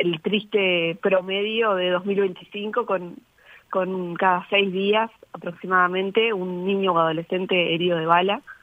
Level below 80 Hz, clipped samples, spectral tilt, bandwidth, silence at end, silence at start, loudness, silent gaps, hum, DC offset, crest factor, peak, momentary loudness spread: -70 dBFS; under 0.1%; -7.5 dB/octave; 3.9 kHz; 0.1 s; 0 s; -22 LUFS; none; none; under 0.1%; 20 dB; -2 dBFS; 8 LU